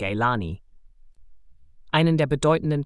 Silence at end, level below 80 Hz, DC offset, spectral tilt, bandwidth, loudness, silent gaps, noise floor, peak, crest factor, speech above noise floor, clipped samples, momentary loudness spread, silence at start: 0 s; -48 dBFS; under 0.1%; -6.5 dB/octave; 11.5 kHz; -23 LUFS; none; -48 dBFS; -8 dBFS; 18 dB; 26 dB; under 0.1%; 12 LU; 0 s